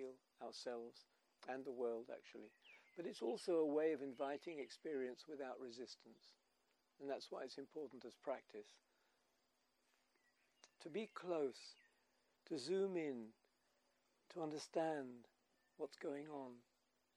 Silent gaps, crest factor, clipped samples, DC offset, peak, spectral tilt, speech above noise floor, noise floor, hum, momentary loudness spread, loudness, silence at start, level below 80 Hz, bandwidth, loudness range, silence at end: none; 20 dB; under 0.1%; under 0.1%; -28 dBFS; -5 dB/octave; 37 dB; -84 dBFS; none; 18 LU; -48 LUFS; 0 s; under -90 dBFS; 12 kHz; 8 LU; 0.55 s